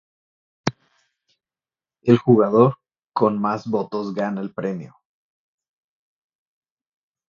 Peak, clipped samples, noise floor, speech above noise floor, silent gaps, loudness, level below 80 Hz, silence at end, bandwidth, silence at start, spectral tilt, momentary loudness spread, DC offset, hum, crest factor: 0 dBFS; under 0.1%; under -90 dBFS; over 71 dB; 3.04-3.08 s; -21 LUFS; -62 dBFS; 2.4 s; 7.2 kHz; 0.65 s; -8 dB/octave; 13 LU; under 0.1%; none; 22 dB